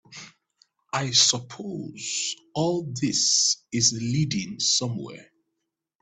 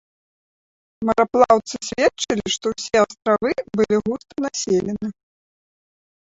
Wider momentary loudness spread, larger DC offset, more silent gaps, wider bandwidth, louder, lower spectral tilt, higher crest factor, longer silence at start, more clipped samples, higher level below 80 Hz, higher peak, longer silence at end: first, 16 LU vs 11 LU; neither; neither; first, 9.4 kHz vs 8 kHz; second, -23 LUFS vs -20 LUFS; second, -2.5 dB/octave vs -4 dB/octave; about the same, 22 dB vs 20 dB; second, 0.1 s vs 1 s; neither; second, -62 dBFS vs -54 dBFS; second, -6 dBFS vs -2 dBFS; second, 0.8 s vs 1.15 s